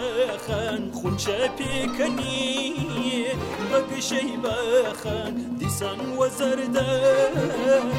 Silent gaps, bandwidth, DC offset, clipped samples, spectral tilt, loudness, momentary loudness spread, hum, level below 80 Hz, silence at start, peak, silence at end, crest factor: none; 16.5 kHz; under 0.1%; under 0.1%; -4.5 dB/octave; -25 LUFS; 7 LU; none; -50 dBFS; 0 s; -10 dBFS; 0 s; 14 dB